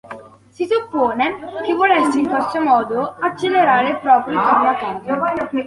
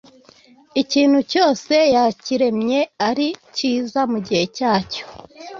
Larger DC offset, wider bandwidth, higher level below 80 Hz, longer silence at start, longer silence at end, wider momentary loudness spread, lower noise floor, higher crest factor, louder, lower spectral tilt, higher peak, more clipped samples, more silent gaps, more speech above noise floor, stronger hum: neither; first, 11.5 kHz vs 7.6 kHz; about the same, -58 dBFS vs -58 dBFS; second, 0.05 s vs 0.75 s; about the same, 0 s vs 0 s; about the same, 8 LU vs 8 LU; second, -37 dBFS vs -50 dBFS; about the same, 16 dB vs 16 dB; about the same, -17 LUFS vs -18 LUFS; about the same, -5 dB/octave vs -4.5 dB/octave; about the same, -2 dBFS vs -2 dBFS; neither; neither; second, 21 dB vs 32 dB; neither